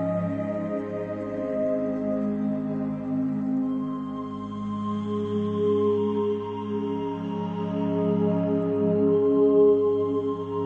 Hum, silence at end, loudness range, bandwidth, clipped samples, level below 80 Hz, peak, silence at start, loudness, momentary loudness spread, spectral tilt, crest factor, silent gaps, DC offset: none; 0 s; 6 LU; 4.4 kHz; under 0.1%; -62 dBFS; -10 dBFS; 0 s; -26 LUFS; 10 LU; -10 dB/octave; 14 dB; none; under 0.1%